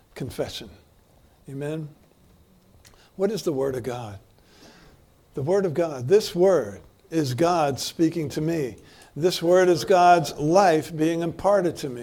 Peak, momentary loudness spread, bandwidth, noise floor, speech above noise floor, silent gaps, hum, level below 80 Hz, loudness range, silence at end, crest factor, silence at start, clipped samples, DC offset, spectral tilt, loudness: -4 dBFS; 16 LU; 17.5 kHz; -57 dBFS; 34 dB; none; none; -56 dBFS; 11 LU; 0 s; 20 dB; 0.15 s; under 0.1%; under 0.1%; -5.5 dB/octave; -23 LUFS